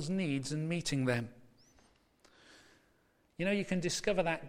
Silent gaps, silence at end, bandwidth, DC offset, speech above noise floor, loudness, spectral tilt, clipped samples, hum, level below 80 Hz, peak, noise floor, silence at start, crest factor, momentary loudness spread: none; 0 s; 16 kHz; under 0.1%; 37 dB; -34 LUFS; -5 dB/octave; under 0.1%; none; -60 dBFS; -18 dBFS; -71 dBFS; 0 s; 18 dB; 5 LU